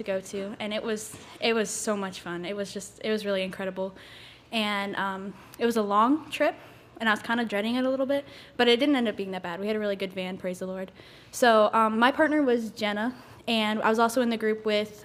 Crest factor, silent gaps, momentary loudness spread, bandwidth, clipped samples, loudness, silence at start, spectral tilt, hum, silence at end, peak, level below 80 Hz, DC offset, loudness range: 20 dB; none; 14 LU; 16 kHz; under 0.1%; -27 LUFS; 0 s; -4 dB/octave; none; 0 s; -6 dBFS; -66 dBFS; under 0.1%; 6 LU